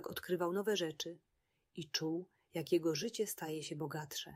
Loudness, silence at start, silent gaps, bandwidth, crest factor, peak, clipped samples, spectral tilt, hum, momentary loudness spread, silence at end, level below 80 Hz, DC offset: -39 LUFS; 0 s; none; 16 kHz; 18 dB; -22 dBFS; under 0.1%; -4 dB/octave; none; 11 LU; 0 s; -80 dBFS; under 0.1%